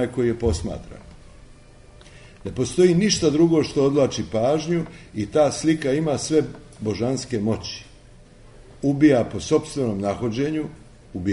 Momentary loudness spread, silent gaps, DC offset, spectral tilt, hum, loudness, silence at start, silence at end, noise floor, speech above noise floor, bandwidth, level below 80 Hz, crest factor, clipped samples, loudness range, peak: 15 LU; none; under 0.1%; -5.5 dB/octave; none; -22 LUFS; 0 s; 0 s; -47 dBFS; 26 dB; 11 kHz; -44 dBFS; 18 dB; under 0.1%; 4 LU; -4 dBFS